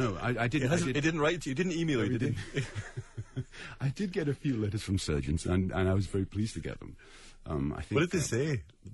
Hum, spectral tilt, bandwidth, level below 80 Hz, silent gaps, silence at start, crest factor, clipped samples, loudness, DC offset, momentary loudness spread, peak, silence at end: none; -6 dB/octave; 11.5 kHz; -48 dBFS; none; 0 s; 16 dB; under 0.1%; -32 LUFS; under 0.1%; 13 LU; -16 dBFS; 0 s